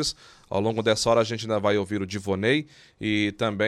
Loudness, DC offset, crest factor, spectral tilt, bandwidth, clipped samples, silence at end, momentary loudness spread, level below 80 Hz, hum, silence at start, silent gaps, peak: -25 LUFS; under 0.1%; 16 dB; -4.5 dB/octave; 13.5 kHz; under 0.1%; 0 s; 9 LU; -56 dBFS; none; 0 s; none; -8 dBFS